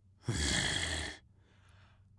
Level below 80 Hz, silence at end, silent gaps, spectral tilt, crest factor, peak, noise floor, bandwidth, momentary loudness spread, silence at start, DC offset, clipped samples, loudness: -48 dBFS; 1 s; none; -2.5 dB/octave; 20 dB; -18 dBFS; -64 dBFS; 11.5 kHz; 12 LU; 0.25 s; under 0.1%; under 0.1%; -34 LUFS